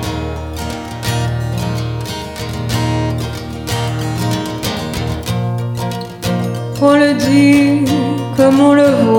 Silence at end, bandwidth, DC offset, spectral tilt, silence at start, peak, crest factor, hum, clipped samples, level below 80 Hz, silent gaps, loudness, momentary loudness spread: 0 s; 17 kHz; under 0.1%; -6 dB/octave; 0 s; 0 dBFS; 14 dB; none; under 0.1%; -36 dBFS; none; -15 LUFS; 14 LU